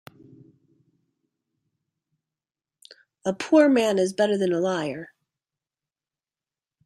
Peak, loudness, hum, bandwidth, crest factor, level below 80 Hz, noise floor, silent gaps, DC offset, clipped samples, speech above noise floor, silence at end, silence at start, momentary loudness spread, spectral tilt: -6 dBFS; -22 LUFS; none; 12.5 kHz; 20 dB; -72 dBFS; under -90 dBFS; none; under 0.1%; under 0.1%; over 69 dB; 1.8 s; 3.25 s; 14 LU; -5.5 dB/octave